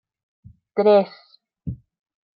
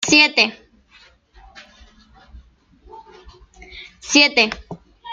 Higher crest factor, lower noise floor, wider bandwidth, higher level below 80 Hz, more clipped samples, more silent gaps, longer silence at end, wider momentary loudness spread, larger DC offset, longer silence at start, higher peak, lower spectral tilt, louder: about the same, 18 dB vs 22 dB; second, -35 dBFS vs -52 dBFS; second, 5.4 kHz vs 12 kHz; about the same, -54 dBFS vs -50 dBFS; neither; neither; first, 0.6 s vs 0 s; second, 20 LU vs 26 LU; neither; first, 0.75 s vs 0 s; second, -6 dBFS vs 0 dBFS; first, -10.5 dB/octave vs -1.5 dB/octave; second, -19 LUFS vs -14 LUFS